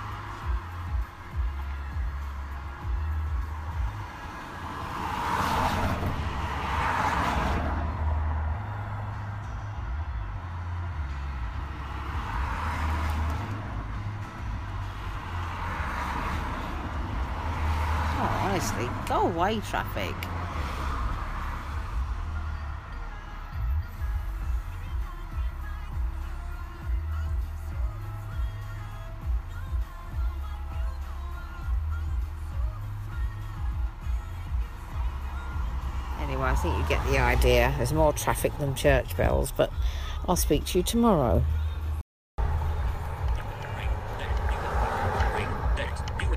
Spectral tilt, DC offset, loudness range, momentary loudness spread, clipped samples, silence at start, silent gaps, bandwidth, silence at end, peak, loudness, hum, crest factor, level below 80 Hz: -5.5 dB/octave; under 0.1%; 9 LU; 11 LU; under 0.1%; 0 s; 42.01-42.38 s; 15.5 kHz; 0 s; -8 dBFS; -30 LUFS; none; 20 dB; -32 dBFS